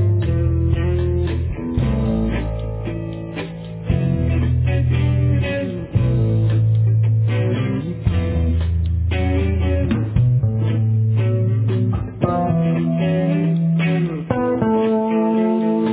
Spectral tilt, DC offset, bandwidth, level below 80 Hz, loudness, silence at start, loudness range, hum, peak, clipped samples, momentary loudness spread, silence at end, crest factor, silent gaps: -12.5 dB/octave; under 0.1%; 4 kHz; -26 dBFS; -19 LUFS; 0 s; 3 LU; none; -4 dBFS; under 0.1%; 6 LU; 0 s; 14 dB; none